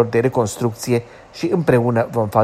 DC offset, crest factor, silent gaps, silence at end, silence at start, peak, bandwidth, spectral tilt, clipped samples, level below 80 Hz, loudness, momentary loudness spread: under 0.1%; 16 dB; none; 0 s; 0 s; -2 dBFS; 15.5 kHz; -6.5 dB/octave; under 0.1%; -50 dBFS; -19 LUFS; 7 LU